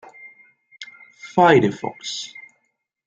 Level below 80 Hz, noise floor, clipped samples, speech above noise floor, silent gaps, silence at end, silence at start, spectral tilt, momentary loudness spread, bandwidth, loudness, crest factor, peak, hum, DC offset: -62 dBFS; -72 dBFS; under 0.1%; 54 dB; none; 0.8 s; 0.25 s; -5 dB/octave; 25 LU; 9 kHz; -19 LUFS; 22 dB; -2 dBFS; none; under 0.1%